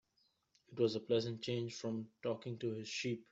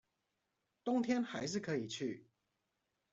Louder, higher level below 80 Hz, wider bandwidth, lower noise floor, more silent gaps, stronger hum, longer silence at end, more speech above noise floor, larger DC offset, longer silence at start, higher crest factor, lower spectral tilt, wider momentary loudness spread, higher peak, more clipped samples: about the same, -40 LUFS vs -39 LUFS; about the same, -80 dBFS vs -80 dBFS; about the same, 8 kHz vs 8 kHz; second, -79 dBFS vs -86 dBFS; neither; neither; second, 0.1 s vs 0.9 s; second, 40 dB vs 48 dB; neither; second, 0.7 s vs 0.85 s; about the same, 18 dB vs 20 dB; about the same, -5.5 dB/octave vs -5 dB/octave; second, 6 LU vs 10 LU; about the same, -22 dBFS vs -22 dBFS; neither